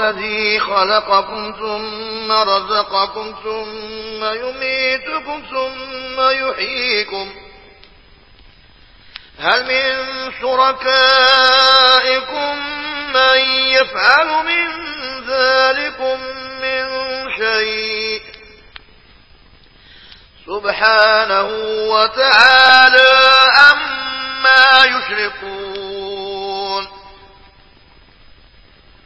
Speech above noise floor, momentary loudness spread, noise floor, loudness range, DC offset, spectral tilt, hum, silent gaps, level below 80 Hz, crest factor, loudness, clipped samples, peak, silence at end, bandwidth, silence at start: 33 dB; 18 LU; -46 dBFS; 13 LU; 0.2%; -2 dB/octave; none; none; -50 dBFS; 16 dB; -13 LUFS; 0.1%; 0 dBFS; 1.95 s; 8 kHz; 0 s